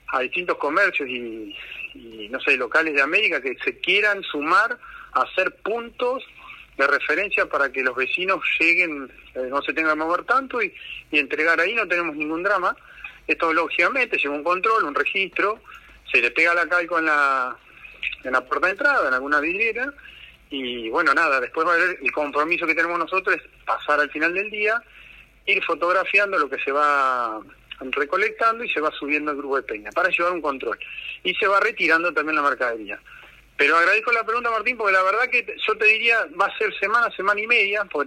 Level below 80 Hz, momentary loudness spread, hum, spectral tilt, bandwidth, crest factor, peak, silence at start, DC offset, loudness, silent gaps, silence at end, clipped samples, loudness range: -58 dBFS; 12 LU; none; -3 dB/octave; 14.5 kHz; 16 dB; -6 dBFS; 0.1 s; under 0.1%; -21 LUFS; none; 0 s; under 0.1%; 3 LU